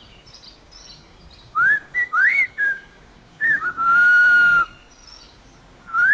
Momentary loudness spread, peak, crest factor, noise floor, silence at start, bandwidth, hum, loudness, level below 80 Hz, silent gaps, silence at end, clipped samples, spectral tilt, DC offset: 12 LU; -8 dBFS; 12 dB; -48 dBFS; 0.9 s; 7.6 kHz; none; -16 LUFS; -54 dBFS; none; 0 s; under 0.1%; -2 dB/octave; under 0.1%